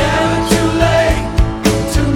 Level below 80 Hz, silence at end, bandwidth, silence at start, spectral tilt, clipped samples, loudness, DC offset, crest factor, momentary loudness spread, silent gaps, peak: -20 dBFS; 0 s; 17.5 kHz; 0 s; -5.5 dB/octave; under 0.1%; -14 LUFS; under 0.1%; 12 dB; 3 LU; none; 0 dBFS